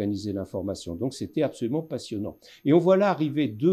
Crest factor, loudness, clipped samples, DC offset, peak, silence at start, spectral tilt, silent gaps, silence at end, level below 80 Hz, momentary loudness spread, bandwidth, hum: 18 dB; -26 LUFS; under 0.1%; under 0.1%; -8 dBFS; 0 s; -7 dB/octave; none; 0 s; -64 dBFS; 13 LU; 13.5 kHz; none